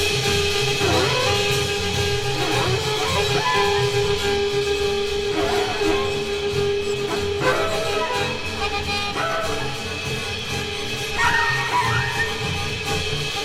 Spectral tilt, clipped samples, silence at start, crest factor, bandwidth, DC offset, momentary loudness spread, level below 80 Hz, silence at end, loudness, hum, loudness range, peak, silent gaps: -3.5 dB/octave; under 0.1%; 0 s; 16 dB; 16.5 kHz; under 0.1%; 6 LU; -40 dBFS; 0 s; -21 LUFS; none; 3 LU; -6 dBFS; none